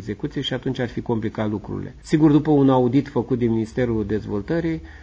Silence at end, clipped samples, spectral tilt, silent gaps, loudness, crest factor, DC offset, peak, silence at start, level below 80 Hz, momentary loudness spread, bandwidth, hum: 0 s; under 0.1%; -8 dB/octave; none; -21 LUFS; 16 dB; under 0.1%; -6 dBFS; 0 s; -42 dBFS; 11 LU; 8 kHz; none